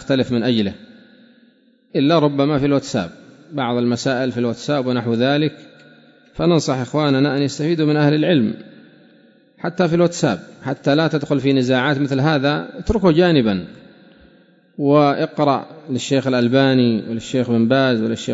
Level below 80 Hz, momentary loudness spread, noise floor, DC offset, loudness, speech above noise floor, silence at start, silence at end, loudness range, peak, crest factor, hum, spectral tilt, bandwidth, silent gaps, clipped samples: -46 dBFS; 10 LU; -54 dBFS; under 0.1%; -18 LUFS; 37 dB; 0 s; 0 s; 3 LU; -2 dBFS; 16 dB; none; -6.5 dB/octave; 8 kHz; none; under 0.1%